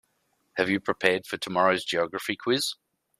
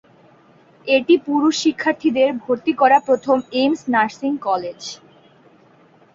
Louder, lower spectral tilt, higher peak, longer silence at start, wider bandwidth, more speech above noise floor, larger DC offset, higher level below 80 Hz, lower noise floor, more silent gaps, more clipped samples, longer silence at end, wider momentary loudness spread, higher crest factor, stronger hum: second, -26 LUFS vs -18 LUFS; about the same, -3.5 dB/octave vs -3.5 dB/octave; about the same, -4 dBFS vs -2 dBFS; second, 0.55 s vs 0.85 s; first, 15 kHz vs 7.8 kHz; first, 46 dB vs 34 dB; neither; second, -70 dBFS vs -64 dBFS; first, -72 dBFS vs -52 dBFS; neither; neither; second, 0.45 s vs 1.2 s; second, 7 LU vs 12 LU; first, 24 dB vs 18 dB; neither